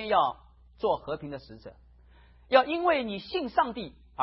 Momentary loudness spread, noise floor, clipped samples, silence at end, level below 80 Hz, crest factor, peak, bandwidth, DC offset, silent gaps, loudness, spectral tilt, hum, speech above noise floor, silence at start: 18 LU; -56 dBFS; under 0.1%; 0 s; -56 dBFS; 22 dB; -8 dBFS; 5.8 kHz; under 0.1%; none; -28 LUFS; -8.5 dB/octave; none; 28 dB; 0 s